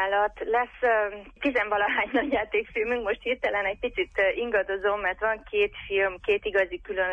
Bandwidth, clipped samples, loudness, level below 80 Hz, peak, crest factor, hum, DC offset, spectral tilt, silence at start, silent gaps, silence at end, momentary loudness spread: 7.4 kHz; under 0.1%; -26 LUFS; -52 dBFS; -12 dBFS; 14 dB; none; under 0.1%; -5.5 dB/octave; 0 s; none; 0 s; 4 LU